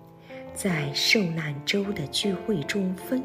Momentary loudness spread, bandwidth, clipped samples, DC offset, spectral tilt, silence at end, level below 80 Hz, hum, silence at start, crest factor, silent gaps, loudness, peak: 11 LU; 16 kHz; under 0.1%; under 0.1%; -4 dB/octave; 0 s; -58 dBFS; none; 0 s; 18 dB; none; -26 LUFS; -8 dBFS